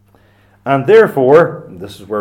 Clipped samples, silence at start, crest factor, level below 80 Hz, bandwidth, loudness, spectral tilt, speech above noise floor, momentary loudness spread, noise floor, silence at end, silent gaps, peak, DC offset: 0.1%; 0.65 s; 12 dB; -56 dBFS; 16 kHz; -10 LUFS; -7.5 dB/octave; 38 dB; 21 LU; -49 dBFS; 0 s; none; 0 dBFS; under 0.1%